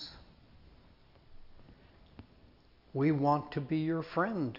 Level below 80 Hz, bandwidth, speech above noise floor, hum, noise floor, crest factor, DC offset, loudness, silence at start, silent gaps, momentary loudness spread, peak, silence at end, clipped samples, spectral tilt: -62 dBFS; 5.8 kHz; 30 dB; none; -61 dBFS; 20 dB; under 0.1%; -32 LUFS; 0 s; none; 9 LU; -16 dBFS; 0 s; under 0.1%; -6.5 dB/octave